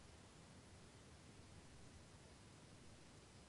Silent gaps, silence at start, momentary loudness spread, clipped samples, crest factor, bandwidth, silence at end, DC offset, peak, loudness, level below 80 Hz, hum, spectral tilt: none; 0 s; 1 LU; under 0.1%; 14 dB; 11.5 kHz; 0 s; under 0.1%; -50 dBFS; -63 LUFS; -72 dBFS; none; -4 dB/octave